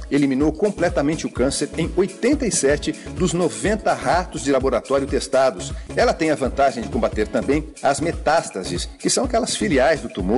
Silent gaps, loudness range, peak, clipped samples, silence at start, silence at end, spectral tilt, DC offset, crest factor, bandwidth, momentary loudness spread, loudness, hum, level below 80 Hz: none; 1 LU; -8 dBFS; under 0.1%; 0 s; 0 s; -4.5 dB/octave; under 0.1%; 12 dB; 11.5 kHz; 5 LU; -20 LUFS; none; -36 dBFS